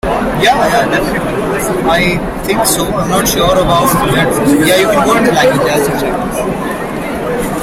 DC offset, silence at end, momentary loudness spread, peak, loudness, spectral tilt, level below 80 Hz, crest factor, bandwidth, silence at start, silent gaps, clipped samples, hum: under 0.1%; 0 s; 8 LU; 0 dBFS; -11 LUFS; -4 dB/octave; -30 dBFS; 12 dB; 16.5 kHz; 0.05 s; none; under 0.1%; none